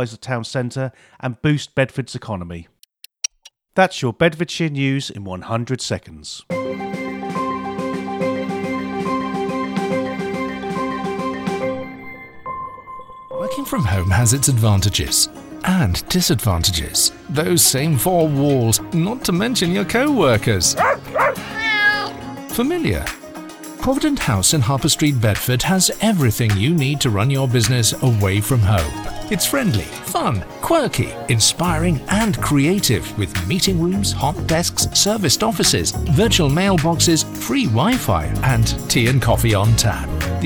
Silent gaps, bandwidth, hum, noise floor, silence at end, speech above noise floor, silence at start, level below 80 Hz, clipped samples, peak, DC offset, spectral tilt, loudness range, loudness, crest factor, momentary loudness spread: none; over 20 kHz; none; -51 dBFS; 0 s; 33 dB; 0 s; -36 dBFS; under 0.1%; -2 dBFS; under 0.1%; -4 dB/octave; 8 LU; -18 LUFS; 18 dB; 12 LU